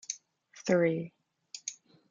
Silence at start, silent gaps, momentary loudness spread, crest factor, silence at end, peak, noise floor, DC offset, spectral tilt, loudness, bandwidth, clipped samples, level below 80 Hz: 0.1 s; none; 17 LU; 22 dB; 0.4 s; -12 dBFS; -58 dBFS; under 0.1%; -5 dB/octave; -33 LUFS; 9.2 kHz; under 0.1%; -78 dBFS